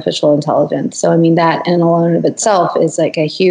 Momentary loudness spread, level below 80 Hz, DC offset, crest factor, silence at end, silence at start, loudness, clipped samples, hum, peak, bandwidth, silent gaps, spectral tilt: 4 LU; -66 dBFS; under 0.1%; 12 dB; 0 s; 0 s; -13 LUFS; under 0.1%; none; 0 dBFS; 10.5 kHz; none; -5.5 dB/octave